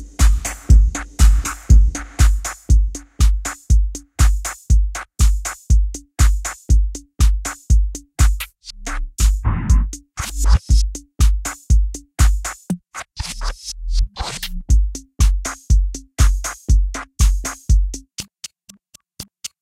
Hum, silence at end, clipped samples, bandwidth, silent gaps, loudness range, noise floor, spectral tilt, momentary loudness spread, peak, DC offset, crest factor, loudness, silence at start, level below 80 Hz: none; 0.15 s; under 0.1%; 15 kHz; none; 5 LU; -48 dBFS; -4 dB/octave; 12 LU; 0 dBFS; under 0.1%; 16 dB; -20 LUFS; 0 s; -16 dBFS